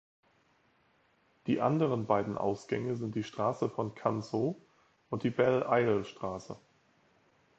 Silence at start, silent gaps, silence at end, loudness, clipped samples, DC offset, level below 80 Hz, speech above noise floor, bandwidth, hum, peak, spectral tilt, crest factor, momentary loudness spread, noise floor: 1.45 s; none; 1 s; -32 LUFS; under 0.1%; under 0.1%; -68 dBFS; 38 dB; 8.2 kHz; none; -14 dBFS; -7.5 dB/octave; 20 dB; 12 LU; -70 dBFS